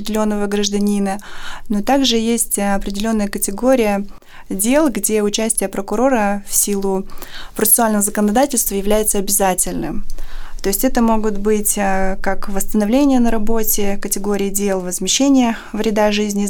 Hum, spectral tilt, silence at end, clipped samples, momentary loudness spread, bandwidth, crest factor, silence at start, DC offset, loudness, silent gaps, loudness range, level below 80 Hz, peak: none; -3.5 dB/octave; 0 s; under 0.1%; 9 LU; over 20 kHz; 12 dB; 0 s; under 0.1%; -16 LUFS; none; 2 LU; -28 dBFS; -4 dBFS